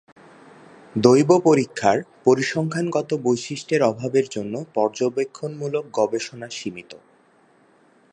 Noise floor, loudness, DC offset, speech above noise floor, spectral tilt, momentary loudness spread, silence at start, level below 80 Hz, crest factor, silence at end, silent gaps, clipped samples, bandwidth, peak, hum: -57 dBFS; -21 LUFS; under 0.1%; 36 dB; -5.5 dB/octave; 15 LU; 0.95 s; -66 dBFS; 22 dB; 1.15 s; none; under 0.1%; 10.5 kHz; 0 dBFS; none